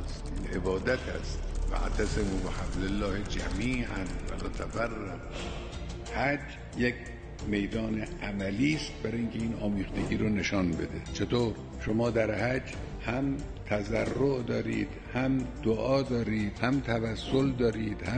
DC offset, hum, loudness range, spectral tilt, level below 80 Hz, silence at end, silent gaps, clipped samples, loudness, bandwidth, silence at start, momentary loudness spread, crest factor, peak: under 0.1%; none; 4 LU; -6 dB/octave; -40 dBFS; 0 s; none; under 0.1%; -32 LUFS; 9.6 kHz; 0 s; 9 LU; 20 dB; -10 dBFS